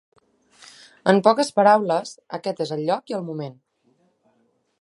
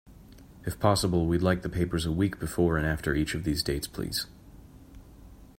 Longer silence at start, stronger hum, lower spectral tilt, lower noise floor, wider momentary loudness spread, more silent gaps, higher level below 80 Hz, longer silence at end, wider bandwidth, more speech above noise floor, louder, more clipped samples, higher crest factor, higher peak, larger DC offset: first, 1.05 s vs 0.05 s; neither; about the same, -5.5 dB/octave vs -5.5 dB/octave; first, -66 dBFS vs -50 dBFS; first, 16 LU vs 7 LU; neither; second, -74 dBFS vs -44 dBFS; first, 1.3 s vs 0.15 s; second, 11.5 kHz vs 16 kHz; first, 46 dB vs 23 dB; first, -21 LUFS vs -28 LUFS; neither; about the same, 22 dB vs 20 dB; first, -2 dBFS vs -8 dBFS; neither